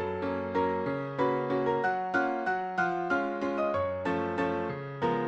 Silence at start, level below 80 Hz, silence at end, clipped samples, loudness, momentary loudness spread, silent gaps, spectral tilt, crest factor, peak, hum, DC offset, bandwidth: 0 s; -64 dBFS; 0 s; under 0.1%; -30 LUFS; 4 LU; none; -7.5 dB/octave; 14 dB; -16 dBFS; none; under 0.1%; 8.2 kHz